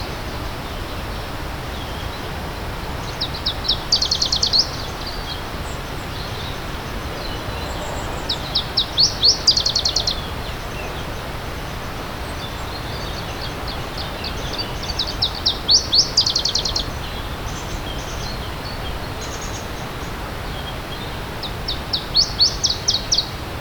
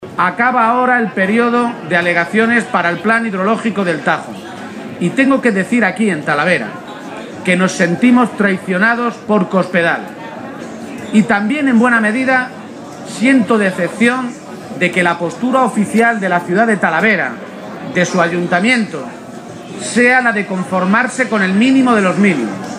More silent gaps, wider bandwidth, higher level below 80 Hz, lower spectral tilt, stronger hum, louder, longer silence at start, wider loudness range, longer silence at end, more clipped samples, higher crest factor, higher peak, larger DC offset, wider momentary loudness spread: neither; first, over 20 kHz vs 12 kHz; first, -32 dBFS vs -60 dBFS; second, -2.5 dB/octave vs -5.5 dB/octave; neither; second, -21 LUFS vs -13 LUFS; about the same, 0 s vs 0 s; first, 10 LU vs 2 LU; about the same, 0 s vs 0 s; neither; first, 20 dB vs 14 dB; about the same, -2 dBFS vs 0 dBFS; neither; second, 14 LU vs 17 LU